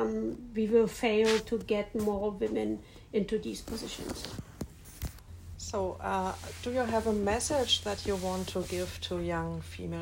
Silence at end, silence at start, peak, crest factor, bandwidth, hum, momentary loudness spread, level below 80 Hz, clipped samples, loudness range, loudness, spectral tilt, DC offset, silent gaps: 0 s; 0 s; -14 dBFS; 18 dB; 16 kHz; none; 15 LU; -50 dBFS; under 0.1%; 7 LU; -32 LUFS; -4.5 dB/octave; under 0.1%; none